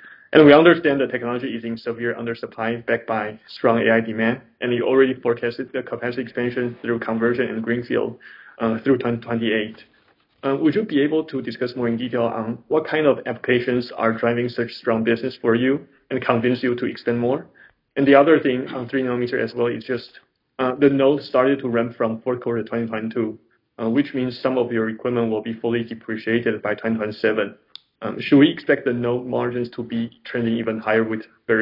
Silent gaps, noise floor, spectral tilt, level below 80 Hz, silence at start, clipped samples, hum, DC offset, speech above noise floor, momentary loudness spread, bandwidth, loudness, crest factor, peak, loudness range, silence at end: none; -60 dBFS; -9 dB/octave; -64 dBFS; 0 s; under 0.1%; none; under 0.1%; 39 dB; 11 LU; 5.6 kHz; -21 LUFS; 20 dB; 0 dBFS; 4 LU; 0 s